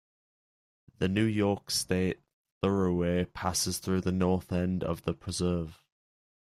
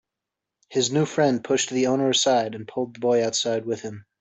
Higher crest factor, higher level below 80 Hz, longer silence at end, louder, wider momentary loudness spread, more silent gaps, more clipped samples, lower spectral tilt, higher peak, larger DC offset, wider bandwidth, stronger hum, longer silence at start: about the same, 18 dB vs 16 dB; first, -56 dBFS vs -68 dBFS; first, 0.7 s vs 0.2 s; second, -30 LUFS vs -23 LUFS; second, 6 LU vs 11 LU; first, 2.33-2.45 s, 2.52-2.61 s vs none; neither; first, -5 dB/octave vs -3.5 dB/octave; second, -12 dBFS vs -8 dBFS; neither; first, 14.5 kHz vs 8.4 kHz; neither; first, 1 s vs 0.7 s